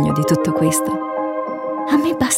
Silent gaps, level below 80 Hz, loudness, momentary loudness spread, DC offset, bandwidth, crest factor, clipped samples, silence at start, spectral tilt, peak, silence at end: none; -48 dBFS; -19 LUFS; 7 LU; under 0.1%; 16.5 kHz; 14 dB; under 0.1%; 0 s; -5 dB/octave; -4 dBFS; 0 s